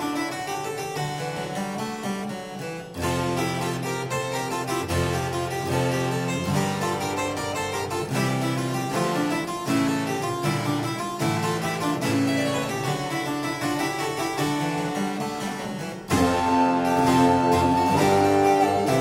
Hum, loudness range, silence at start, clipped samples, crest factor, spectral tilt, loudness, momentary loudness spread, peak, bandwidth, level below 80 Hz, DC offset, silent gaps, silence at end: none; 6 LU; 0 s; under 0.1%; 16 dB; -5 dB/octave; -25 LUFS; 10 LU; -8 dBFS; 16 kHz; -50 dBFS; under 0.1%; none; 0 s